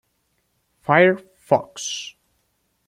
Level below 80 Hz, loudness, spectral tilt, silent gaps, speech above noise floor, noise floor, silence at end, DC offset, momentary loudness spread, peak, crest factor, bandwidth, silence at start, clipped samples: -68 dBFS; -20 LUFS; -4.5 dB/octave; none; 51 dB; -70 dBFS; 0.75 s; under 0.1%; 17 LU; -2 dBFS; 22 dB; 13.5 kHz; 0.9 s; under 0.1%